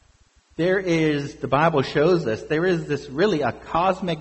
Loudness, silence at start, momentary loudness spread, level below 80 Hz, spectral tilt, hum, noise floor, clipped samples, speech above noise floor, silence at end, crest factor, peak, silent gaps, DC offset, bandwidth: -22 LUFS; 0.6 s; 6 LU; -50 dBFS; -6.5 dB/octave; none; -58 dBFS; under 0.1%; 37 dB; 0 s; 16 dB; -6 dBFS; none; under 0.1%; 8.2 kHz